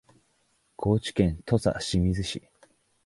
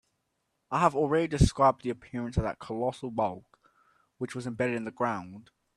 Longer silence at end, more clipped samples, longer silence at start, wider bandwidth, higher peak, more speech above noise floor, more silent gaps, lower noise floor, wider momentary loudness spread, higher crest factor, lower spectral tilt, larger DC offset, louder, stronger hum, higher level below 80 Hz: first, 0.65 s vs 0.35 s; neither; about the same, 0.8 s vs 0.7 s; about the same, 11.5 kHz vs 12.5 kHz; about the same, -8 dBFS vs -8 dBFS; second, 44 dB vs 50 dB; neither; second, -69 dBFS vs -79 dBFS; second, 8 LU vs 13 LU; about the same, 20 dB vs 22 dB; about the same, -6 dB/octave vs -6.5 dB/octave; neither; about the same, -27 LUFS vs -29 LUFS; neither; about the same, -42 dBFS vs -44 dBFS